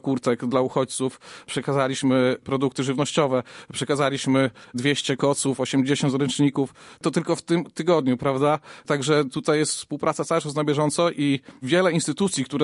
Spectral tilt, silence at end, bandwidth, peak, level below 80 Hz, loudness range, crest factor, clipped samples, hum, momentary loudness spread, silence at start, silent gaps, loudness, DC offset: -5 dB/octave; 0 s; 11.5 kHz; -6 dBFS; -62 dBFS; 1 LU; 16 dB; under 0.1%; none; 6 LU; 0.05 s; none; -23 LUFS; under 0.1%